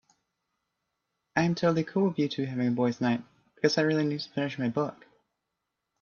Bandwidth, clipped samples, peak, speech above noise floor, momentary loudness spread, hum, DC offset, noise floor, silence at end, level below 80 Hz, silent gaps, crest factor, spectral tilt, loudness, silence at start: 7 kHz; under 0.1%; -8 dBFS; 56 dB; 7 LU; none; under 0.1%; -84 dBFS; 1.1 s; -70 dBFS; none; 20 dB; -6.5 dB/octave; -28 LUFS; 1.35 s